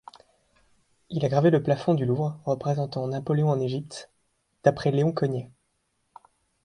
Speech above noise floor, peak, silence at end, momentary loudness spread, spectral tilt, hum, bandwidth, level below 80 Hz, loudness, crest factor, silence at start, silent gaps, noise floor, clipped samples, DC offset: 49 dB; -4 dBFS; 1.2 s; 13 LU; -8 dB/octave; none; 10.5 kHz; -62 dBFS; -25 LUFS; 22 dB; 1.1 s; none; -74 dBFS; under 0.1%; under 0.1%